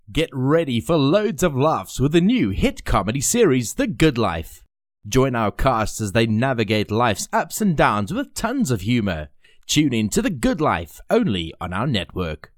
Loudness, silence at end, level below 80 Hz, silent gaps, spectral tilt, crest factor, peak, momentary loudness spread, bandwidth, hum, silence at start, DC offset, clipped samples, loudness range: -20 LUFS; 0.2 s; -36 dBFS; none; -5 dB/octave; 16 dB; -4 dBFS; 7 LU; 18.5 kHz; none; 0.1 s; under 0.1%; under 0.1%; 2 LU